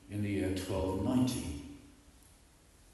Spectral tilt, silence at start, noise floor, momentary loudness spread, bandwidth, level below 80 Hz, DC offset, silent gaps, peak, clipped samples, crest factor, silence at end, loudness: -6 dB/octave; 0.05 s; -62 dBFS; 17 LU; 12.5 kHz; -52 dBFS; under 0.1%; none; -20 dBFS; under 0.1%; 18 dB; 0.85 s; -35 LUFS